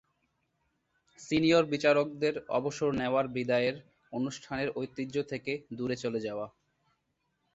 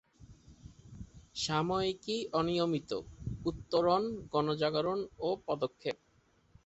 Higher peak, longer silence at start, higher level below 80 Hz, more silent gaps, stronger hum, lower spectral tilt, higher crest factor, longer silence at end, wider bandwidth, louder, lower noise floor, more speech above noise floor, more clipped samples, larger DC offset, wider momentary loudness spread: first, -12 dBFS vs -16 dBFS; first, 1.2 s vs 0.2 s; second, -66 dBFS vs -58 dBFS; neither; neither; about the same, -5.5 dB/octave vs -5.5 dB/octave; about the same, 20 dB vs 18 dB; first, 1.05 s vs 0.7 s; about the same, 8 kHz vs 8.2 kHz; first, -31 LUFS vs -34 LUFS; first, -79 dBFS vs -69 dBFS; first, 49 dB vs 36 dB; neither; neither; about the same, 12 LU vs 14 LU